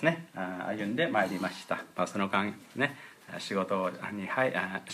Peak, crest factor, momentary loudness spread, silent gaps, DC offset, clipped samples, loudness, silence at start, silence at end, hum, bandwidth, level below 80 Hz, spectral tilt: -10 dBFS; 22 dB; 9 LU; none; under 0.1%; under 0.1%; -32 LUFS; 0 s; 0 s; none; 15.5 kHz; -78 dBFS; -5.5 dB/octave